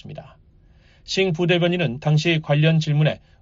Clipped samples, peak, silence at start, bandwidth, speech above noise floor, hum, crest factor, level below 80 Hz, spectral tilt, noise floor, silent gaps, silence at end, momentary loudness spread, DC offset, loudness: under 0.1%; -6 dBFS; 0.05 s; 7.6 kHz; 33 dB; none; 14 dB; -54 dBFS; -5.5 dB/octave; -52 dBFS; none; 0.25 s; 7 LU; under 0.1%; -20 LUFS